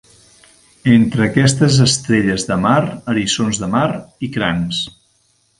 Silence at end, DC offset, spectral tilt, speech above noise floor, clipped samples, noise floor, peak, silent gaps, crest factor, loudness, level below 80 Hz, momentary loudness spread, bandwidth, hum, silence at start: 0.7 s; under 0.1%; -5 dB/octave; 44 dB; under 0.1%; -59 dBFS; 0 dBFS; none; 16 dB; -15 LUFS; -44 dBFS; 9 LU; 11.5 kHz; none; 0.85 s